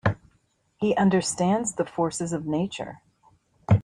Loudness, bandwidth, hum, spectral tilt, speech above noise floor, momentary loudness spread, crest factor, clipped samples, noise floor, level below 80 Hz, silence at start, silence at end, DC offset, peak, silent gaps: -25 LUFS; 11.5 kHz; none; -5.5 dB/octave; 43 dB; 15 LU; 18 dB; under 0.1%; -67 dBFS; -54 dBFS; 0.05 s; 0 s; under 0.1%; -8 dBFS; none